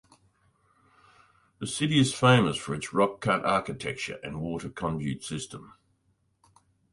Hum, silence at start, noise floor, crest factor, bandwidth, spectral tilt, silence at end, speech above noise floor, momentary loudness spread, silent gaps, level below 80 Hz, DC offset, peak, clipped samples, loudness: none; 1.6 s; -71 dBFS; 22 dB; 11.5 kHz; -5 dB/octave; 1.25 s; 44 dB; 15 LU; none; -58 dBFS; under 0.1%; -8 dBFS; under 0.1%; -27 LUFS